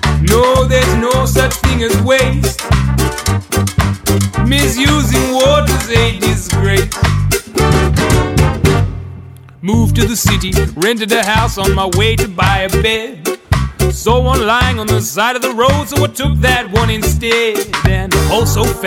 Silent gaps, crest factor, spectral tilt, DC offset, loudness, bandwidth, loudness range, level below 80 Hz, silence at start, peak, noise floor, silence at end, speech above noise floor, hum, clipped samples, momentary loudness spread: none; 12 dB; -4.5 dB/octave; under 0.1%; -13 LUFS; 17 kHz; 1 LU; -20 dBFS; 0 s; 0 dBFS; -32 dBFS; 0 s; 20 dB; none; under 0.1%; 5 LU